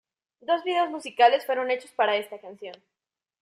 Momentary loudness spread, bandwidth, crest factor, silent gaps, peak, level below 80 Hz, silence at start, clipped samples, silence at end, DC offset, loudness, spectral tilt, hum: 20 LU; 14.5 kHz; 20 dB; none; -6 dBFS; -84 dBFS; 0.5 s; under 0.1%; 0.65 s; under 0.1%; -24 LUFS; -3 dB/octave; none